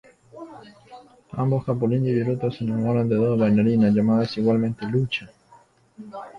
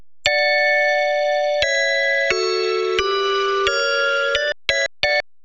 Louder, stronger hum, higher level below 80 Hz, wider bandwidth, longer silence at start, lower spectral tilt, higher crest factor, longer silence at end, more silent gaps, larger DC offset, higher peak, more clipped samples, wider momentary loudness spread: second, -22 LUFS vs -18 LUFS; neither; second, -56 dBFS vs -50 dBFS; second, 6.4 kHz vs 9.8 kHz; first, 0.35 s vs 0 s; first, -9 dB/octave vs -1.5 dB/octave; about the same, 14 dB vs 18 dB; about the same, 0 s vs 0 s; neither; neither; second, -10 dBFS vs 0 dBFS; neither; first, 20 LU vs 4 LU